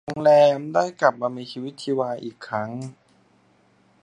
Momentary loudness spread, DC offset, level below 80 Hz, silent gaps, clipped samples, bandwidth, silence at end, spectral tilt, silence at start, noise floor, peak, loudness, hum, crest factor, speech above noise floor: 17 LU; under 0.1%; -68 dBFS; none; under 0.1%; 10 kHz; 1.1 s; -6 dB/octave; 0.05 s; -60 dBFS; -2 dBFS; -22 LUFS; none; 22 dB; 38 dB